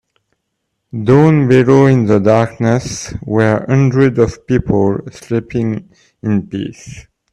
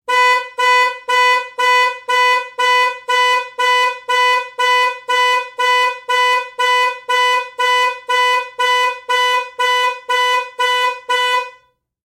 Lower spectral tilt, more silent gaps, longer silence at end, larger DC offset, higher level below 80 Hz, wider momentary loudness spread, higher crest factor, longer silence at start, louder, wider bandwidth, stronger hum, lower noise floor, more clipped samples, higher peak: first, -7.5 dB/octave vs 3 dB/octave; neither; second, 0.3 s vs 0.65 s; neither; first, -40 dBFS vs -74 dBFS; first, 15 LU vs 4 LU; about the same, 14 dB vs 12 dB; first, 0.95 s vs 0.1 s; about the same, -13 LUFS vs -14 LUFS; second, 10.5 kHz vs 16.5 kHz; neither; first, -71 dBFS vs -52 dBFS; neither; first, 0 dBFS vs -4 dBFS